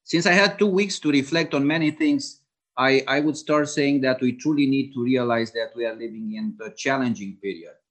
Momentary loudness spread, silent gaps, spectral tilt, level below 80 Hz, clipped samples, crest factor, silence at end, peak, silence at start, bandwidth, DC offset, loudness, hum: 13 LU; none; -5 dB/octave; -72 dBFS; under 0.1%; 20 dB; 0.2 s; -4 dBFS; 0.1 s; 9 kHz; under 0.1%; -22 LUFS; none